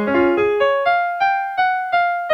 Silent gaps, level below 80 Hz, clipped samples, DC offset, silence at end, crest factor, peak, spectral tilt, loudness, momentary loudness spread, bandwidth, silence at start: none; -54 dBFS; under 0.1%; under 0.1%; 0 s; 12 dB; -4 dBFS; -6 dB/octave; -17 LUFS; 3 LU; 6.4 kHz; 0 s